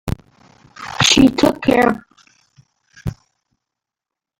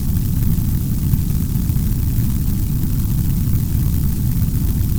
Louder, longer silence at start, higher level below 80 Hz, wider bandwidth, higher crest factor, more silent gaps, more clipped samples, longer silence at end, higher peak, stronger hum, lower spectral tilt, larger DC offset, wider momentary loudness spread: first, -13 LUFS vs -19 LUFS; about the same, 0.05 s vs 0 s; second, -40 dBFS vs -22 dBFS; second, 16.5 kHz vs over 20 kHz; about the same, 18 dB vs 16 dB; neither; neither; first, 1.25 s vs 0 s; about the same, 0 dBFS vs 0 dBFS; neither; second, -4 dB/octave vs -7 dB/octave; neither; first, 20 LU vs 1 LU